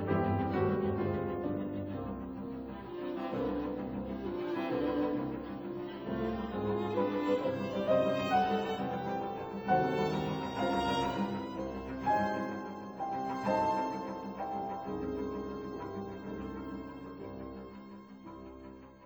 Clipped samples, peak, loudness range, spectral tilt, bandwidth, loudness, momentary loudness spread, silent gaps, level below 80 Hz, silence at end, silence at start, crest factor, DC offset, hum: under 0.1%; -18 dBFS; 8 LU; -7 dB/octave; over 20 kHz; -35 LUFS; 13 LU; none; -56 dBFS; 0 s; 0 s; 18 dB; under 0.1%; none